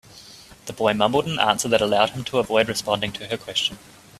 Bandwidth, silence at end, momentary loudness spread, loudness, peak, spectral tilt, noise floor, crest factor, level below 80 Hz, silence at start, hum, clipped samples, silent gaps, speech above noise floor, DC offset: 15 kHz; 0.4 s; 10 LU; -22 LUFS; -2 dBFS; -3.5 dB/octave; -45 dBFS; 22 dB; -54 dBFS; 0.1 s; none; under 0.1%; none; 23 dB; under 0.1%